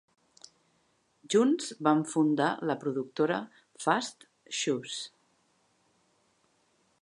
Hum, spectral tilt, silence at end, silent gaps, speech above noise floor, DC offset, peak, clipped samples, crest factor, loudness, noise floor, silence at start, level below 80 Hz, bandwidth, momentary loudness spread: none; -4.5 dB/octave; 1.95 s; none; 43 dB; under 0.1%; -10 dBFS; under 0.1%; 22 dB; -30 LUFS; -71 dBFS; 1.3 s; -86 dBFS; 11 kHz; 12 LU